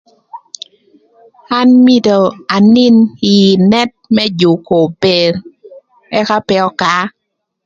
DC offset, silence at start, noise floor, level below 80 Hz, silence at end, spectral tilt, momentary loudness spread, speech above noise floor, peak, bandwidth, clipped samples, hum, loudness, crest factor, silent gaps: under 0.1%; 0.35 s; -49 dBFS; -52 dBFS; 0.55 s; -6 dB/octave; 12 LU; 40 dB; 0 dBFS; 7.6 kHz; under 0.1%; none; -10 LUFS; 12 dB; none